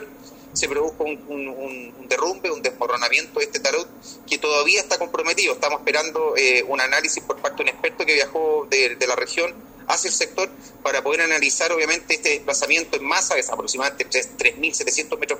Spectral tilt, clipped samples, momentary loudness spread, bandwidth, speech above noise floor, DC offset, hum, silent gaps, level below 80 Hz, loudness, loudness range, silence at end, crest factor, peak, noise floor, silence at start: 0 dB/octave; under 0.1%; 10 LU; 16 kHz; 21 dB; under 0.1%; none; none; -58 dBFS; -20 LUFS; 4 LU; 0 s; 20 dB; -2 dBFS; -43 dBFS; 0 s